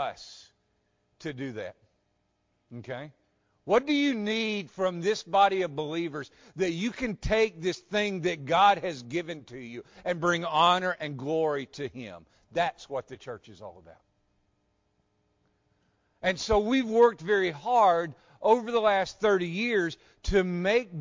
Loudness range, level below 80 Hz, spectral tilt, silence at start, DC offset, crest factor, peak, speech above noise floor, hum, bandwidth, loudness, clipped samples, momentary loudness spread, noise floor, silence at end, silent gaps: 13 LU; -50 dBFS; -5 dB/octave; 0 s; under 0.1%; 20 dB; -10 dBFS; 47 dB; none; 7.6 kHz; -27 LUFS; under 0.1%; 19 LU; -74 dBFS; 0 s; none